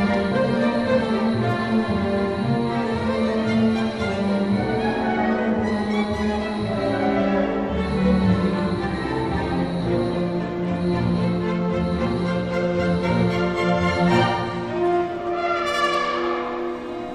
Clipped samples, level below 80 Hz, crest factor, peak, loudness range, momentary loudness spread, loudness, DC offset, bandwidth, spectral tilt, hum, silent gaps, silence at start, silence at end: under 0.1%; -40 dBFS; 14 dB; -8 dBFS; 2 LU; 5 LU; -22 LUFS; under 0.1%; 11 kHz; -7 dB/octave; none; none; 0 s; 0 s